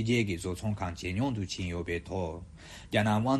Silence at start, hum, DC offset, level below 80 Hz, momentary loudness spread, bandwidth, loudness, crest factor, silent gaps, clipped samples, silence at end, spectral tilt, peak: 0 s; none; under 0.1%; -50 dBFS; 11 LU; 13 kHz; -32 LUFS; 18 dB; none; under 0.1%; 0 s; -6 dB/octave; -12 dBFS